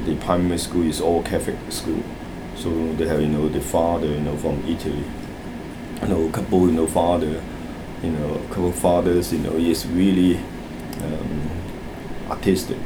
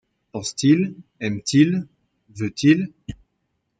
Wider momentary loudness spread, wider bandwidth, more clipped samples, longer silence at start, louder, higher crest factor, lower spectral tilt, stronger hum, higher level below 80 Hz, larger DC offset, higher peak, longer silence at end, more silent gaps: second, 14 LU vs 18 LU; first, over 20 kHz vs 9.4 kHz; neither; second, 0 s vs 0.35 s; about the same, -22 LUFS vs -21 LUFS; about the same, 20 dB vs 18 dB; about the same, -6 dB/octave vs -5.5 dB/octave; neither; first, -38 dBFS vs -56 dBFS; neither; about the same, -2 dBFS vs -4 dBFS; second, 0 s vs 0.65 s; neither